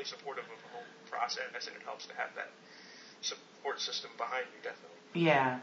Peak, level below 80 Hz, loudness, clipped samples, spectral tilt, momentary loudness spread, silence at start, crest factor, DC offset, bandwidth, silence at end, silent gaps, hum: -14 dBFS; under -90 dBFS; -37 LUFS; under 0.1%; -2.5 dB/octave; 18 LU; 0 s; 24 dB; under 0.1%; 7.6 kHz; 0 s; none; none